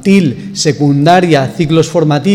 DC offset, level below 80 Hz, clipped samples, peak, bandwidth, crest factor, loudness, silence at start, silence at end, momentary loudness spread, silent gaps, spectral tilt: under 0.1%; -46 dBFS; 0.2%; 0 dBFS; 13 kHz; 10 dB; -10 LUFS; 0 s; 0 s; 6 LU; none; -6 dB/octave